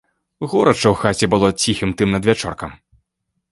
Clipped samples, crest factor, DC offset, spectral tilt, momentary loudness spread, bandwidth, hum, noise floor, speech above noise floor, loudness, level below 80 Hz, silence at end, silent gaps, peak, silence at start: under 0.1%; 18 dB; under 0.1%; -5 dB/octave; 13 LU; 11.5 kHz; none; -74 dBFS; 58 dB; -17 LUFS; -42 dBFS; 0.8 s; none; 0 dBFS; 0.4 s